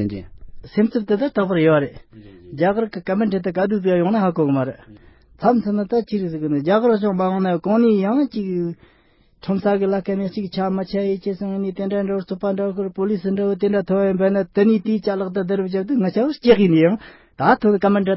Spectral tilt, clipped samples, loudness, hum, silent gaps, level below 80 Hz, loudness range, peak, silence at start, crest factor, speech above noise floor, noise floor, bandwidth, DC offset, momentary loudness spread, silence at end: -12 dB/octave; under 0.1%; -19 LUFS; none; none; -52 dBFS; 4 LU; -2 dBFS; 0 s; 18 dB; 37 dB; -56 dBFS; 5.8 kHz; under 0.1%; 8 LU; 0 s